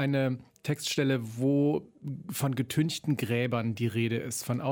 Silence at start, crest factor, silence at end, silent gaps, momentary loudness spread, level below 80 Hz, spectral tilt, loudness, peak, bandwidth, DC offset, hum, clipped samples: 0 s; 14 dB; 0 s; none; 7 LU; -68 dBFS; -5.5 dB/octave; -30 LUFS; -14 dBFS; 17.5 kHz; under 0.1%; none; under 0.1%